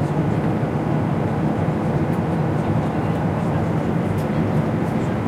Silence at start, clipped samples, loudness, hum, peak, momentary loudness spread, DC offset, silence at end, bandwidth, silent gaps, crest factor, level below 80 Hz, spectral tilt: 0 s; under 0.1%; -21 LUFS; none; -8 dBFS; 1 LU; under 0.1%; 0 s; 13 kHz; none; 12 dB; -42 dBFS; -8.5 dB/octave